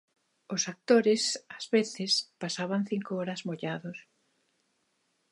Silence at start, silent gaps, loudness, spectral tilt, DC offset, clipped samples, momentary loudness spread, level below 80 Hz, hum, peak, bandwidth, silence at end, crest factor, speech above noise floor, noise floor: 0.5 s; none; -30 LUFS; -3.5 dB/octave; under 0.1%; under 0.1%; 12 LU; -84 dBFS; none; -10 dBFS; 11.5 kHz; 1.3 s; 20 dB; 46 dB; -75 dBFS